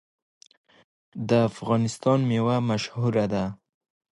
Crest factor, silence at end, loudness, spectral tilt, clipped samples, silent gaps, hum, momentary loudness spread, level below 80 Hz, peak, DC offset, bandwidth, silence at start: 18 dB; 0.6 s; -25 LUFS; -7 dB/octave; under 0.1%; none; none; 9 LU; -58 dBFS; -8 dBFS; under 0.1%; 11.5 kHz; 1.15 s